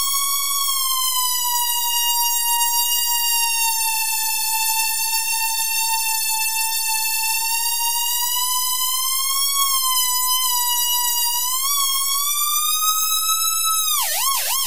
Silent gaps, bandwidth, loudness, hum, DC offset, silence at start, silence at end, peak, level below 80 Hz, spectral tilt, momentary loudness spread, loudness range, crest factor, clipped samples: none; 16 kHz; -17 LUFS; none; 3%; 0 s; 0 s; -4 dBFS; -68 dBFS; 4.5 dB/octave; 2 LU; 1 LU; 16 dB; under 0.1%